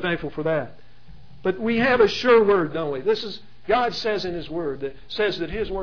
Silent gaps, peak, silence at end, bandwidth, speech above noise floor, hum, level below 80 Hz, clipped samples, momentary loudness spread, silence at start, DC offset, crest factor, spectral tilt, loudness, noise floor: none; -4 dBFS; 0 s; 5.4 kHz; 26 dB; none; -46 dBFS; under 0.1%; 13 LU; 0 s; 1%; 18 dB; -5.5 dB/octave; -22 LUFS; -48 dBFS